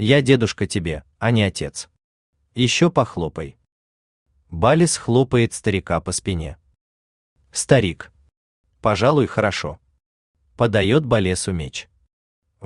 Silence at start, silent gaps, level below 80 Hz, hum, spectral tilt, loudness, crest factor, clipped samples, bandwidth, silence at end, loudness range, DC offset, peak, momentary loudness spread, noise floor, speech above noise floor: 0 s; 2.04-2.33 s, 3.72-4.26 s, 6.81-7.36 s, 8.37-8.64 s, 10.06-10.34 s, 12.13-12.42 s; -46 dBFS; none; -5 dB/octave; -20 LUFS; 20 dB; under 0.1%; 12.5 kHz; 0 s; 3 LU; under 0.1%; -2 dBFS; 16 LU; under -90 dBFS; over 71 dB